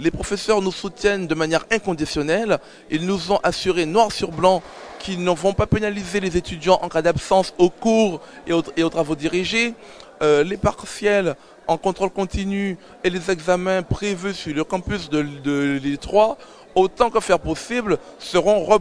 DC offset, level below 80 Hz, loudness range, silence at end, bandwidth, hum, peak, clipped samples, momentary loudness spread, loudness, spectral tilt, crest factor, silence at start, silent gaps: under 0.1%; -42 dBFS; 3 LU; 0 s; 11 kHz; none; 0 dBFS; under 0.1%; 7 LU; -21 LUFS; -5 dB/octave; 20 dB; 0 s; none